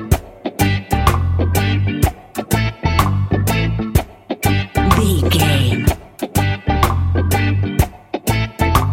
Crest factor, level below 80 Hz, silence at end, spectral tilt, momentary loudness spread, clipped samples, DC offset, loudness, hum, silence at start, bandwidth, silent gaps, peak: 16 dB; -24 dBFS; 0 s; -5.5 dB/octave; 6 LU; under 0.1%; under 0.1%; -17 LUFS; none; 0 s; 17 kHz; none; 0 dBFS